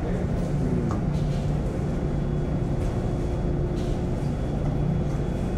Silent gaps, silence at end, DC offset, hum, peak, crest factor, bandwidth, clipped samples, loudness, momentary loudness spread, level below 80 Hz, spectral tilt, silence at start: none; 0 s; under 0.1%; none; -14 dBFS; 12 dB; 10.5 kHz; under 0.1%; -27 LUFS; 2 LU; -30 dBFS; -8.5 dB/octave; 0 s